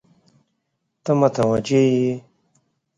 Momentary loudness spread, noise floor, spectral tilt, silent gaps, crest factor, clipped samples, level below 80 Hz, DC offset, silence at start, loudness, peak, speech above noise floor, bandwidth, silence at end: 12 LU; -75 dBFS; -7 dB/octave; none; 18 dB; under 0.1%; -58 dBFS; under 0.1%; 1.05 s; -19 LUFS; -4 dBFS; 57 dB; 10.5 kHz; 0.8 s